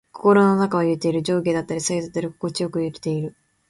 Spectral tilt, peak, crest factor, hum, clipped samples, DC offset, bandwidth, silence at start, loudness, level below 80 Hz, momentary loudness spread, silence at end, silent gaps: -5.5 dB/octave; -4 dBFS; 18 dB; none; under 0.1%; under 0.1%; 11.5 kHz; 0.15 s; -21 LUFS; -60 dBFS; 11 LU; 0.4 s; none